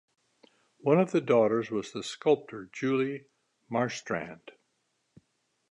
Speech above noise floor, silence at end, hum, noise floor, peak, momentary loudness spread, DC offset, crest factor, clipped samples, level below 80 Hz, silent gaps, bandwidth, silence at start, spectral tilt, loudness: 48 dB; 1.2 s; none; -77 dBFS; -10 dBFS; 15 LU; under 0.1%; 20 dB; under 0.1%; -74 dBFS; none; 10.5 kHz; 0.85 s; -6 dB/octave; -29 LUFS